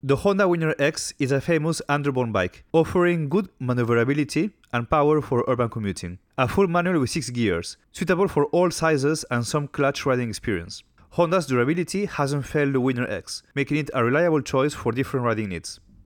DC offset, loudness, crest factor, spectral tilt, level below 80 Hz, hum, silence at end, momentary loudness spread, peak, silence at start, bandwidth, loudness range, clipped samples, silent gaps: under 0.1%; -23 LUFS; 16 dB; -6 dB/octave; -52 dBFS; none; 0.3 s; 9 LU; -6 dBFS; 0.05 s; 19.5 kHz; 2 LU; under 0.1%; none